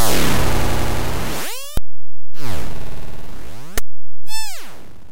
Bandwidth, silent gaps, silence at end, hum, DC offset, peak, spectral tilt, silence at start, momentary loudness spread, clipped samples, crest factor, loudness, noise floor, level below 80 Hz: 16.5 kHz; none; 0 s; none; 30%; -4 dBFS; -4 dB/octave; 0 s; 18 LU; under 0.1%; 10 dB; -25 LUFS; -48 dBFS; -30 dBFS